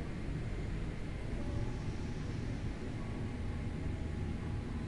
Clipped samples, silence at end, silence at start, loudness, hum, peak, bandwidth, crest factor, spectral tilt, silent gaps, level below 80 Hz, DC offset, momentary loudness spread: under 0.1%; 0 s; 0 s; -41 LUFS; none; -26 dBFS; 11.5 kHz; 12 dB; -7.5 dB/octave; none; -44 dBFS; under 0.1%; 2 LU